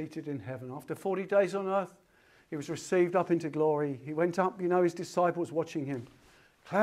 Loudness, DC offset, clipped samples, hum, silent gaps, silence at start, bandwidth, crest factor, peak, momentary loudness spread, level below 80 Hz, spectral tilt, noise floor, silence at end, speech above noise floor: -31 LUFS; under 0.1%; under 0.1%; none; none; 0 s; 14 kHz; 20 dB; -12 dBFS; 13 LU; -76 dBFS; -6.5 dB/octave; -63 dBFS; 0 s; 33 dB